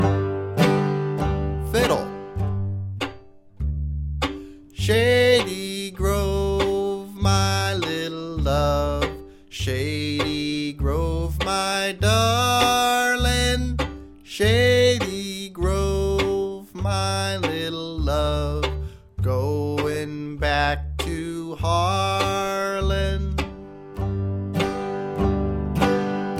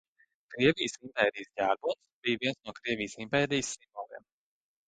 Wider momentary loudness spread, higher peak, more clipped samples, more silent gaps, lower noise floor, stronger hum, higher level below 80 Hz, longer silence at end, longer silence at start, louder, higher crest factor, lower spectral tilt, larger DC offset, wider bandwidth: second, 11 LU vs 17 LU; first, -2 dBFS vs -10 dBFS; neither; second, none vs 2.12-2.23 s; second, -44 dBFS vs -51 dBFS; neither; first, -32 dBFS vs -64 dBFS; second, 0 s vs 0.7 s; second, 0 s vs 0.5 s; first, -23 LUFS vs -31 LUFS; about the same, 20 dB vs 22 dB; about the same, -5 dB/octave vs -4 dB/octave; neither; first, 16.5 kHz vs 9.8 kHz